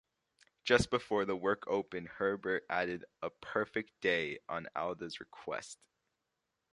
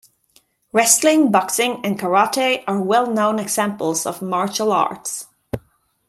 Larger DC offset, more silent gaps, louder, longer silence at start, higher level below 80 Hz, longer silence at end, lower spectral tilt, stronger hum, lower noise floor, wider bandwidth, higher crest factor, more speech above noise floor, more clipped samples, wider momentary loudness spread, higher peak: neither; neither; second, -36 LUFS vs -18 LUFS; about the same, 0.65 s vs 0.75 s; second, -62 dBFS vs -56 dBFS; first, 1 s vs 0.5 s; first, -4.5 dB/octave vs -3 dB/octave; neither; first, -86 dBFS vs -58 dBFS; second, 11.5 kHz vs 16 kHz; first, 26 dB vs 20 dB; first, 50 dB vs 40 dB; neither; about the same, 13 LU vs 14 LU; second, -12 dBFS vs 0 dBFS